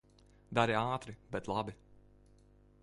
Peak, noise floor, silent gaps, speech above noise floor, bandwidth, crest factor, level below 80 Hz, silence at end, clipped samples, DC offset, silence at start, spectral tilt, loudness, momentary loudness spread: -14 dBFS; -63 dBFS; none; 28 dB; 11.5 kHz; 24 dB; -62 dBFS; 0.85 s; under 0.1%; under 0.1%; 0.5 s; -6 dB/octave; -36 LUFS; 12 LU